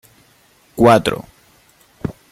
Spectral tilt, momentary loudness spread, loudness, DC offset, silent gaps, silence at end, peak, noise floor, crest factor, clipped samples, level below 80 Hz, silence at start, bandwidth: -6 dB/octave; 18 LU; -14 LUFS; under 0.1%; none; 0.2 s; 0 dBFS; -53 dBFS; 18 dB; under 0.1%; -46 dBFS; 0.75 s; 16 kHz